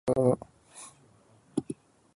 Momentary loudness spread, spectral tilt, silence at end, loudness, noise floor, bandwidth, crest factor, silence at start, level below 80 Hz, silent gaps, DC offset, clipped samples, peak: 22 LU; -7.5 dB/octave; 0.45 s; -30 LUFS; -61 dBFS; 11.5 kHz; 22 dB; 0.05 s; -62 dBFS; none; under 0.1%; under 0.1%; -10 dBFS